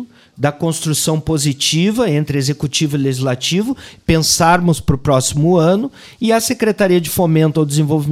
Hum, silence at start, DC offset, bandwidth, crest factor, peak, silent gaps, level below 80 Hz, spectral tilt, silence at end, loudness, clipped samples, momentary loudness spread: none; 0 s; under 0.1%; 16 kHz; 14 dB; -2 dBFS; none; -38 dBFS; -5 dB/octave; 0 s; -15 LUFS; under 0.1%; 7 LU